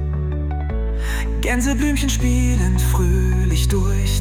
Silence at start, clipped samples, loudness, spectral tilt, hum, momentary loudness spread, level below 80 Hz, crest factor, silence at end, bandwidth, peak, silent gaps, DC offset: 0 s; under 0.1%; -20 LUFS; -5.5 dB/octave; none; 6 LU; -20 dBFS; 10 dB; 0 s; 16 kHz; -8 dBFS; none; under 0.1%